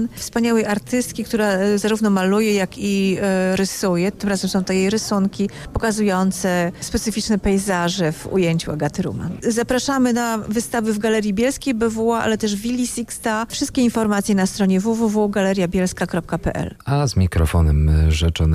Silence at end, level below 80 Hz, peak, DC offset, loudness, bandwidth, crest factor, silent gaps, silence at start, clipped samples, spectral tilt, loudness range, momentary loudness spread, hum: 0 s; -30 dBFS; -8 dBFS; under 0.1%; -19 LUFS; 15.5 kHz; 12 dB; none; 0 s; under 0.1%; -5.5 dB/octave; 2 LU; 5 LU; none